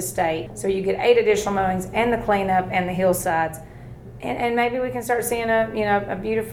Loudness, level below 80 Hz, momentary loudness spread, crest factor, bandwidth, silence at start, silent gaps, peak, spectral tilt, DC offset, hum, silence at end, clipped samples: -22 LUFS; -46 dBFS; 9 LU; 16 dB; 17.5 kHz; 0 s; none; -6 dBFS; -4.5 dB/octave; under 0.1%; none; 0 s; under 0.1%